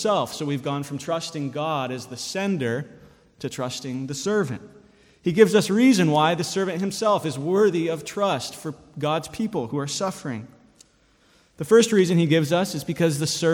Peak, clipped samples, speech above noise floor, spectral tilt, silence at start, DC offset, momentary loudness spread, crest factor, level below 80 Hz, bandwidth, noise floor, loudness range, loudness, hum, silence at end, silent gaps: -2 dBFS; under 0.1%; 37 dB; -5 dB/octave; 0 s; under 0.1%; 14 LU; 22 dB; -62 dBFS; 17.5 kHz; -60 dBFS; 8 LU; -23 LUFS; none; 0 s; none